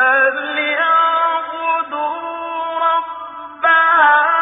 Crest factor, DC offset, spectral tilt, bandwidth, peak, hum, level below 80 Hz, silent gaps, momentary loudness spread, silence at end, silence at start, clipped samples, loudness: 14 dB; under 0.1%; -4.5 dB/octave; 3.9 kHz; 0 dBFS; none; -68 dBFS; none; 13 LU; 0 s; 0 s; under 0.1%; -15 LUFS